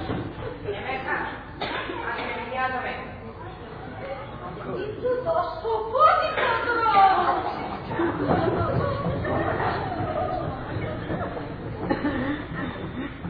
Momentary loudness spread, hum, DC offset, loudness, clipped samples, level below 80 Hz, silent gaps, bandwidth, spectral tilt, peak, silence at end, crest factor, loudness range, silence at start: 16 LU; none; under 0.1%; -26 LUFS; under 0.1%; -44 dBFS; none; 5.2 kHz; -9 dB/octave; -6 dBFS; 0 s; 20 dB; 9 LU; 0 s